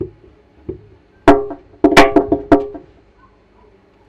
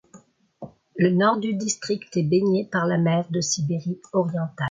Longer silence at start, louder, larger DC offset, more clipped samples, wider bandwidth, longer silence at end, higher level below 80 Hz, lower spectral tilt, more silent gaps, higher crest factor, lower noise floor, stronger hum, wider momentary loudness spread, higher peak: second, 0 s vs 0.15 s; first, -13 LUFS vs -23 LUFS; neither; first, 0.4% vs under 0.1%; first, 15 kHz vs 9.6 kHz; first, 1.3 s vs 0 s; first, -34 dBFS vs -64 dBFS; about the same, -5 dB/octave vs -5.5 dB/octave; neither; about the same, 16 dB vs 16 dB; about the same, -50 dBFS vs -53 dBFS; neither; first, 23 LU vs 8 LU; first, 0 dBFS vs -6 dBFS